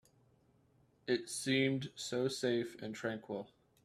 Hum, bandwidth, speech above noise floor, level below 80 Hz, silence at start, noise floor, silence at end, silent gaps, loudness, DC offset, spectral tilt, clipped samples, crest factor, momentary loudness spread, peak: none; 14.5 kHz; 34 dB; -76 dBFS; 1.05 s; -71 dBFS; 0.4 s; none; -37 LUFS; under 0.1%; -4.5 dB/octave; under 0.1%; 20 dB; 13 LU; -18 dBFS